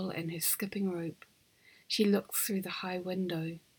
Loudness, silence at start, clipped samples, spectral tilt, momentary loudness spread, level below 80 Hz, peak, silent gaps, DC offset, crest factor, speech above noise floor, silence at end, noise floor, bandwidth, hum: -33 LUFS; 0 s; under 0.1%; -4 dB/octave; 8 LU; -76 dBFS; -16 dBFS; none; under 0.1%; 18 dB; 30 dB; 0.2 s; -64 dBFS; over 20 kHz; none